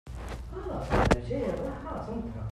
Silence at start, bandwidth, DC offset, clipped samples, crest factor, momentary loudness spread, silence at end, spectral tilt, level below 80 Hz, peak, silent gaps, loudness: 0.05 s; 13.5 kHz; under 0.1%; under 0.1%; 24 dB; 14 LU; 0 s; -6.5 dB/octave; -38 dBFS; -6 dBFS; none; -32 LUFS